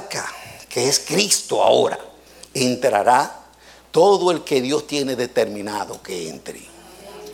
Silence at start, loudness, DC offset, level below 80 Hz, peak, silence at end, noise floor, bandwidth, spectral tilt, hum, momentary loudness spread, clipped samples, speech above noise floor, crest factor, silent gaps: 0 s; -19 LUFS; under 0.1%; -58 dBFS; -2 dBFS; 0 s; -47 dBFS; 17 kHz; -3 dB/octave; none; 17 LU; under 0.1%; 28 dB; 18 dB; none